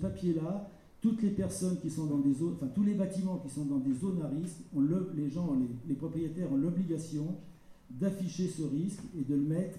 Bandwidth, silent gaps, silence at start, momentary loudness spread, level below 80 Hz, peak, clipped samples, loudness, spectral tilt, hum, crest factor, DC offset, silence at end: 14 kHz; none; 0 s; 7 LU; -62 dBFS; -20 dBFS; under 0.1%; -34 LUFS; -8 dB/octave; none; 14 dB; under 0.1%; 0 s